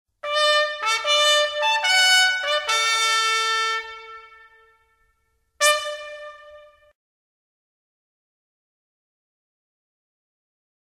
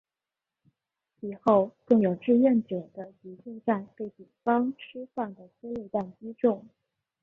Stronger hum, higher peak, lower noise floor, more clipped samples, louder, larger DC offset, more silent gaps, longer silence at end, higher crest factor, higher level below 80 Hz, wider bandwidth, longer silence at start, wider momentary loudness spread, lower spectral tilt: neither; first, -2 dBFS vs -8 dBFS; second, -69 dBFS vs -90 dBFS; neither; first, -18 LUFS vs -27 LUFS; neither; neither; first, 4.35 s vs 0.6 s; about the same, 22 dB vs 20 dB; about the same, -68 dBFS vs -70 dBFS; first, 16 kHz vs 3.9 kHz; second, 0.25 s vs 1.25 s; about the same, 19 LU vs 19 LU; second, 4 dB/octave vs -9.5 dB/octave